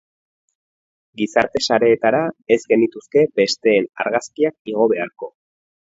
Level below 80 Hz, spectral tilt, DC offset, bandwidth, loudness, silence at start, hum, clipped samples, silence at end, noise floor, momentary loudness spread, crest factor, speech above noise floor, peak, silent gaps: -60 dBFS; -4.5 dB/octave; under 0.1%; 8 kHz; -18 LUFS; 1.2 s; none; under 0.1%; 0.65 s; under -90 dBFS; 7 LU; 20 dB; over 72 dB; 0 dBFS; 4.59-4.65 s